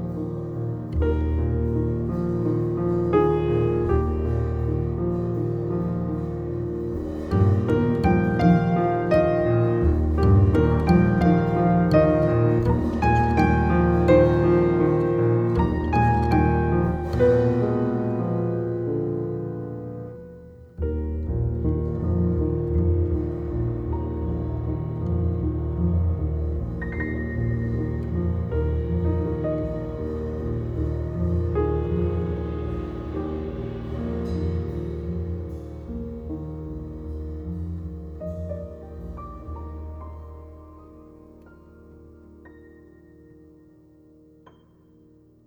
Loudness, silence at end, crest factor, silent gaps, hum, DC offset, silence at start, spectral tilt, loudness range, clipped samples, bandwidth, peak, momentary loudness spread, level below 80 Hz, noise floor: -23 LUFS; 2.85 s; 18 dB; none; none; under 0.1%; 0 s; -10 dB/octave; 14 LU; under 0.1%; 6.2 kHz; -4 dBFS; 15 LU; -32 dBFS; -54 dBFS